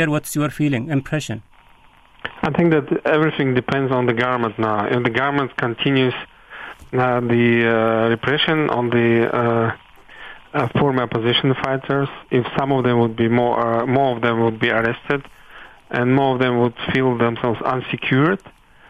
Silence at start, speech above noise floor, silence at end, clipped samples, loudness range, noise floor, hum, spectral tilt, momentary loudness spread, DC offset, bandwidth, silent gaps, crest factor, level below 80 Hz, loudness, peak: 0 s; 31 dB; 0.4 s; under 0.1%; 3 LU; -50 dBFS; none; -6.5 dB/octave; 8 LU; under 0.1%; 13.5 kHz; none; 16 dB; -50 dBFS; -19 LUFS; -2 dBFS